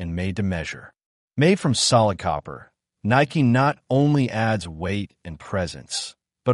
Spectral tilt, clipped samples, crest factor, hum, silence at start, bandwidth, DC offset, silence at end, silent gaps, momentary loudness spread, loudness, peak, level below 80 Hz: -5 dB/octave; under 0.1%; 18 dB; none; 0 s; 11.5 kHz; under 0.1%; 0 s; 1.06-1.28 s; 16 LU; -22 LUFS; -6 dBFS; -48 dBFS